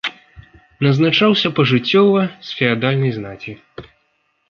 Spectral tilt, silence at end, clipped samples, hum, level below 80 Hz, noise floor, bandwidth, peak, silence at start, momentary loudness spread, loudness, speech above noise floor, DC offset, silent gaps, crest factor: -7 dB/octave; 0.65 s; under 0.1%; none; -54 dBFS; -65 dBFS; 6.8 kHz; -2 dBFS; 0.05 s; 17 LU; -16 LUFS; 49 dB; under 0.1%; none; 16 dB